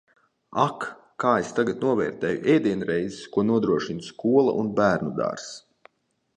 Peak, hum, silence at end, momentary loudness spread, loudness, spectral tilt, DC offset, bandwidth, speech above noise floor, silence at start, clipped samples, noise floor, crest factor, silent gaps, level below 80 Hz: -4 dBFS; none; 0.8 s; 12 LU; -24 LUFS; -6.5 dB/octave; under 0.1%; 10 kHz; 48 dB; 0.5 s; under 0.1%; -72 dBFS; 20 dB; none; -60 dBFS